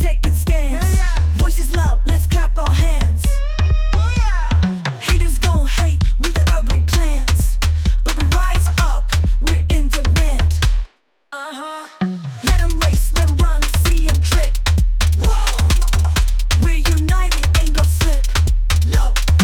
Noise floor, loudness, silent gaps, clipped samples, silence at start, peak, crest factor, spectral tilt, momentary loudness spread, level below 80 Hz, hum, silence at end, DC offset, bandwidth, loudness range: -40 dBFS; -17 LUFS; none; under 0.1%; 0 s; -4 dBFS; 10 dB; -4.5 dB/octave; 3 LU; -16 dBFS; none; 0 s; under 0.1%; 17.5 kHz; 3 LU